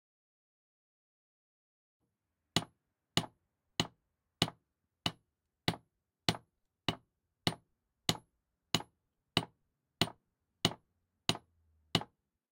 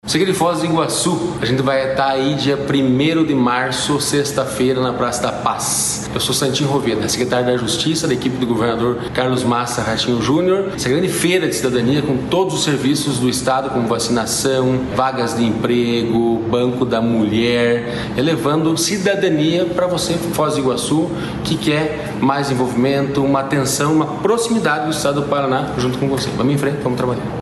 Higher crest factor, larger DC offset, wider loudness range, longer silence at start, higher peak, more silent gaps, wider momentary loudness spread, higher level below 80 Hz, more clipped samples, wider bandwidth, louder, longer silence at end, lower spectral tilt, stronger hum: first, 34 dB vs 14 dB; neither; about the same, 3 LU vs 1 LU; first, 2.55 s vs 0.05 s; second, -8 dBFS vs -2 dBFS; neither; first, 14 LU vs 3 LU; second, -68 dBFS vs -44 dBFS; neither; first, 16 kHz vs 13 kHz; second, -37 LUFS vs -17 LUFS; first, 0.5 s vs 0 s; about the same, -3.5 dB/octave vs -4.5 dB/octave; neither